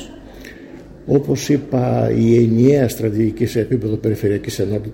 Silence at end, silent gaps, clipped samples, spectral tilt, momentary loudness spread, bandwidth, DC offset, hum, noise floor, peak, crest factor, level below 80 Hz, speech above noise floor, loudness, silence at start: 0 s; none; under 0.1%; -7.5 dB/octave; 23 LU; 17 kHz; under 0.1%; none; -37 dBFS; -2 dBFS; 16 dB; -42 dBFS; 21 dB; -17 LUFS; 0 s